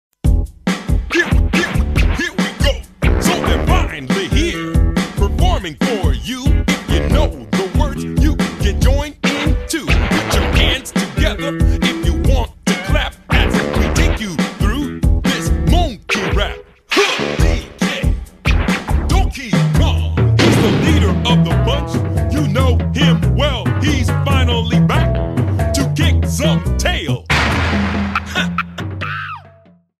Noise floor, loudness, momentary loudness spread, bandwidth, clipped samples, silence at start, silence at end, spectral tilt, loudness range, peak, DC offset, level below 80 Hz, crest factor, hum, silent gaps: -47 dBFS; -16 LUFS; 6 LU; 14.5 kHz; under 0.1%; 0.25 s; 0.55 s; -5.5 dB/octave; 3 LU; 0 dBFS; under 0.1%; -20 dBFS; 14 dB; none; none